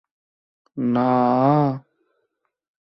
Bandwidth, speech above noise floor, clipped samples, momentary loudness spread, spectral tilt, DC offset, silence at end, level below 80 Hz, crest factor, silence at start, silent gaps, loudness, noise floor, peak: 5.8 kHz; 57 dB; under 0.1%; 15 LU; -11 dB/octave; under 0.1%; 1.1 s; -64 dBFS; 16 dB; 0.75 s; none; -19 LUFS; -75 dBFS; -6 dBFS